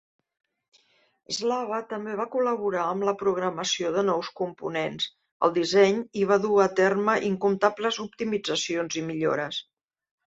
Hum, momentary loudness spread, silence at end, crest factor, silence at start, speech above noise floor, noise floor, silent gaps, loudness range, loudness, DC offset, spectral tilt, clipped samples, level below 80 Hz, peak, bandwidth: none; 10 LU; 0.75 s; 20 dB; 1.3 s; 39 dB; -64 dBFS; 5.32-5.40 s; 5 LU; -26 LUFS; under 0.1%; -4 dB/octave; under 0.1%; -70 dBFS; -6 dBFS; 8 kHz